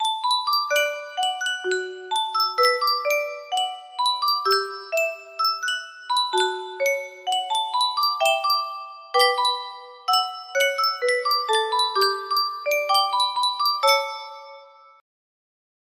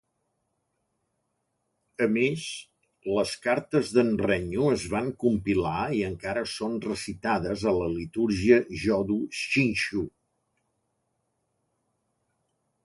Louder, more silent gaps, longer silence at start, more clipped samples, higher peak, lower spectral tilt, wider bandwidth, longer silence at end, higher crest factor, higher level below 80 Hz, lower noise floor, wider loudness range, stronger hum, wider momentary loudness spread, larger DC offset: first, -22 LUFS vs -27 LUFS; neither; second, 0 s vs 2 s; neither; about the same, -6 dBFS vs -6 dBFS; second, 1 dB/octave vs -5.5 dB/octave; first, 16 kHz vs 11.5 kHz; second, 1.35 s vs 2.75 s; about the same, 18 dB vs 22 dB; second, -76 dBFS vs -52 dBFS; second, -47 dBFS vs -78 dBFS; second, 2 LU vs 6 LU; neither; about the same, 8 LU vs 8 LU; neither